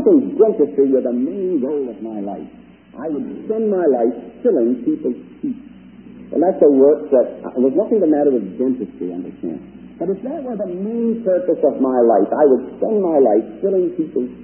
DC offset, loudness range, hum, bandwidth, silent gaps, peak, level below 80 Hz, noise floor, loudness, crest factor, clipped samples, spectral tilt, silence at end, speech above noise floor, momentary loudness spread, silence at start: under 0.1%; 5 LU; none; 3.2 kHz; none; -2 dBFS; -58 dBFS; -39 dBFS; -18 LUFS; 16 dB; under 0.1%; -13.5 dB/octave; 0 s; 22 dB; 13 LU; 0 s